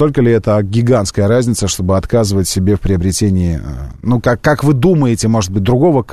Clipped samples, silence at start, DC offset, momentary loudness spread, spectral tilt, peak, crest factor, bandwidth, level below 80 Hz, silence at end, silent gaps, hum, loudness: under 0.1%; 0 s; 1%; 4 LU; -6 dB/octave; 0 dBFS; 12 dB; 13.5 kHz; -30 dBFS; 0 s; none; none; -13 LUFS